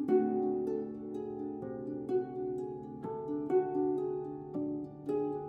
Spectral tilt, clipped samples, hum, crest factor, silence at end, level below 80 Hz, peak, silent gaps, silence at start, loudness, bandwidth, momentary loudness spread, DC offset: -10 dB/octave; under 0.1%; none; 18 dB; 0 s; -70 dBFS; -18 dBFS; none; 0 s; -36 LUFS; 4 kHz; 10 LU; under 0.1%